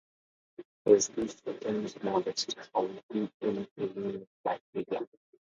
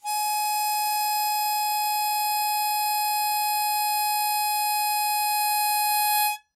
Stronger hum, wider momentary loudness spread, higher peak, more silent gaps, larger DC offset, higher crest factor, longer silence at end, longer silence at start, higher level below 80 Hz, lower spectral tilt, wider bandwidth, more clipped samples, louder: neither; first, 13 LU vs 2 LU; first, -10 dBFS vs -14 dBFS; first, 0.65-0.85 s, 3.03-3.09 s, 3.34-3.40 s, 3.71-3.76 s, 4.27-4.44 s, 4.61-4.73 s vs none; neither; first, 24 dB vs 10 dB; first, 0.55 s vs 0.15 s; first, 0.6 s vs 0.05 s; first, -72 dBFS vs -84 dBFS; first, -4 dB/octave vs 5.5 dB/octave; second, 7.8 kHz vs 16 kHz; neither; second, -32 LUFS vs -23 LUFS